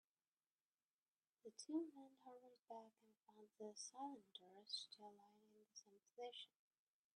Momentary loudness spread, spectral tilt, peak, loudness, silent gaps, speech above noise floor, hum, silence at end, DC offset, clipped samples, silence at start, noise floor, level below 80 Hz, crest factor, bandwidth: 15 LU; -2.5 dB/octave; -36 dBFS; -56 LUFS; 2.59-2.63 s; over 33 dB; none; 0.7 s; under 0.1%; under 0.1%; 1.45 s; under -90 dBFS; under -90 dBFS; 22 dB; 10 kHz